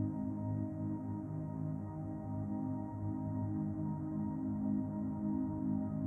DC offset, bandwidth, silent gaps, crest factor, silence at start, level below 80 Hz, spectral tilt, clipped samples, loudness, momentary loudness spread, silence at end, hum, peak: under 0.1%; 2.3 kHz; none; 12 dB; 0 s; -62 dBFS; -12.5 dB/octave; under 0.1%; -39 LUFS; 5 LU; 0 s; none; -26 dBFS